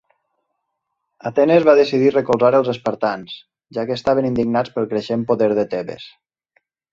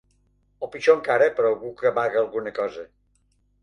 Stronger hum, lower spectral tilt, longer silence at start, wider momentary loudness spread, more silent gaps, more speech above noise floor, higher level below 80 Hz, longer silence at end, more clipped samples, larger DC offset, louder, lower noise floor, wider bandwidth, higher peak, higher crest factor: neither; first, -7 dB/octave vs -5 dB/octave; first, 1.25 s vs 0.6 s; first, 17 LU vs 14 LU; neither; first, 59 dB vs 44 dB; first, -56 dBFS vs -64 dBFS; about the same, 0.85 s vs 0.75 s; neither; neither; first, -17 LUFS vs -22 LUFS; first, -76 dBFS vs -66 dBFS; second, 7.6 kHz vs 9.6 kHz; about the same, -2 dBFS vs -4 dBFS; about the same, 18 dB vs 20 dB